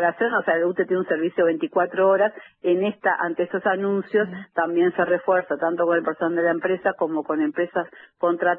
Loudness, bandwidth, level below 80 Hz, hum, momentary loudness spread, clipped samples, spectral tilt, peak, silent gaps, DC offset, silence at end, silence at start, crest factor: -22 LUFS; 3.7 kHz; -68 dBFS; none; 5 LU; under 0.1%; -10 dB/octave; -8 dBFS; none; under 0.1%; 0 s; 0 s; 14 dB